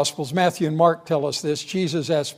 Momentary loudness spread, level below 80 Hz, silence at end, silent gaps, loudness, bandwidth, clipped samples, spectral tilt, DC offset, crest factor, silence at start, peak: 5 LU; -68 dBFS; 0.05 s; none; -22 LUFS; 16 kHz; under 0.1%; -5 dB/octave; under 0.1%; 18 dB; 0 s; -4 dBFS